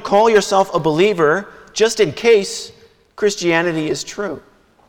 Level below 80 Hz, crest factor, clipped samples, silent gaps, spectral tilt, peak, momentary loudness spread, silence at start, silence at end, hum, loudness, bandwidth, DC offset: -52 dBFS; 14 dB; under 0.1%; none; -4 dB/octave; -2 dBFS; 14 LU; 0 s; 0.5 s; none; -16 LUFS; 16.5 kHz; under 0.1%